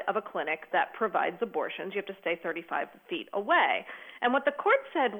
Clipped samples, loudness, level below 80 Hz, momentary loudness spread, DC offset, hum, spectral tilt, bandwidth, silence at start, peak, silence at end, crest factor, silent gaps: under 0.1%; -30 LUFS; -80 dBFS; 10 LU; under 0.1%; none; -6 dB/octave; 19 kHz; 0 s; -12 dBFS; 0 s; 18 dB; none